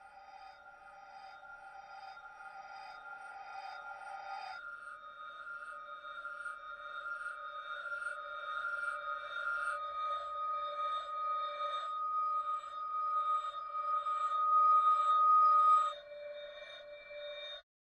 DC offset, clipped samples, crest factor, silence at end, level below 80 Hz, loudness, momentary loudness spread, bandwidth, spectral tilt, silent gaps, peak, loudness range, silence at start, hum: under 0.1%; under 0.1%; 16 dB; 0.2 s; -80 dBFS; -34 LUFS; 23 LU; 9.2 kHz; -0.5 dB/octave; none; -20 dBFS; 18 LU; 0 s; none